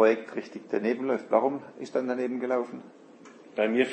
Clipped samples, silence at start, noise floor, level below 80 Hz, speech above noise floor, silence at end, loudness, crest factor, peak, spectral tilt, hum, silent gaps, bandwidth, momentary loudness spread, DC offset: under 0.1%; 0 s; -50 dBFS; -84 dBFS; 23 dB; 0 s; -29 LUFS; 20 dB; -8 dBFS; -6 dB/octave; none; none; 8.6 kHz; 13 LU; under 0.1%